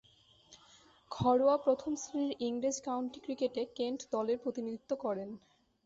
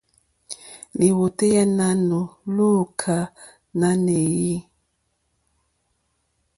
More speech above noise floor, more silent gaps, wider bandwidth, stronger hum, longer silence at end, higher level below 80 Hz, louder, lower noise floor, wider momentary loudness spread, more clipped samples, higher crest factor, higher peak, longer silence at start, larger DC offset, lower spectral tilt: second, 30 dB vs 51 dB; neither; second, 8 kHz vs 11.5 kHz; neither; second, 0.45 s vs 1.95 s; second, -68 dBFS vs -58 dBFS; second, -34 LUFS vs -21 LUFS; second, -64 dBFS vs -71 dBFS; second, 12 LU vs 15 LU; neither; about the same, 18 dB vs 18 dB; second, -18 dBFS vs -6 dBFS; about the same, 0.5 s vs 0.5 s; neither; about the same, -6 dB/octave vs -6 dB/octave